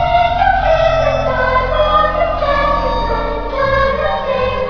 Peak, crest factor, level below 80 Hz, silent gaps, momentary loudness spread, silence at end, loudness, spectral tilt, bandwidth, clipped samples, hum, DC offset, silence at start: -2 dBFS; 12 dB; -24 dBFS; none; 5 LU; 0 s; -14 LUFS; -6 dB/octave; 5.4 kHz; under 0.1%; none; under 0.1%; 0 s